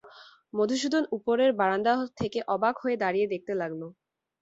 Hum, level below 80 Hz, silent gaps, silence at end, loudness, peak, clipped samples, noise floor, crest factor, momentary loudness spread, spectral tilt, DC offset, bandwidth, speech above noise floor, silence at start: none; -66 dBFS; none; 0.5 s; -27 LUFS; -12 dBFS; under 0.1%; -53 dBFS; 16 dB; 9 LU; -5 dB/octave; under 0.1%; 8 kHz; 26 dB; 0.05 s